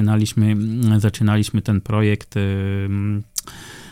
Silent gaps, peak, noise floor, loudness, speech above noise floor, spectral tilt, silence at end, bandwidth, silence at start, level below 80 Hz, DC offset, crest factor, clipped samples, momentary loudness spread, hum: none; -2 dBFS; -38 dBFS; -20 LUFS; 20 dB; -6.5 dB/octave; 0 s; 15.5 kHz; 0 s; -48 dBFS; under 0.1%; 16 dB; under 0.1%; 9 LU; none